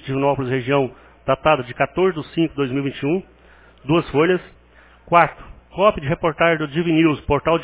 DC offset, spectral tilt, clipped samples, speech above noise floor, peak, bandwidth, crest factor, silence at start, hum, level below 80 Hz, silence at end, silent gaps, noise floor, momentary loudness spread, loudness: under 0.1%; -10.5 dB/octave; under 0.1%; 30 dB; 0 dBFS; 4 kHz; 20 dB; 0.05 s; none; -44 dBFS; 0 s; none; -49 dBFS; 6 LU; -19 LUFS